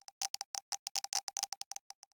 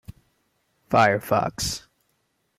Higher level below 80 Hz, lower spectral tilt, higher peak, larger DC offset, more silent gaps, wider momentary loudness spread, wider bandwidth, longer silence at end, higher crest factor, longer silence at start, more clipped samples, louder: second, under -90 dBFS vs -50 dBFS; second, 4 dB/octave vs -4 dB/octave; second, -18 dBFS vs -6 dBFS; neither; first, 0.29-0.34 s, 0.45-0.54 s, 0.62-0.72 s, 0.79-0.95 s, 1.23-1.27 s, 1.48-1.52 s vs none; about the same, 8 LU vs 9 LU; first, over 20 kHz vs 16 kHz; second, 0.6 s vs 0.8 s; about the same, 24 dB vs 20 dB; about the same, 0.2 s vs 0.1 s; neither; second, -39 LUFS vs -23 LUFS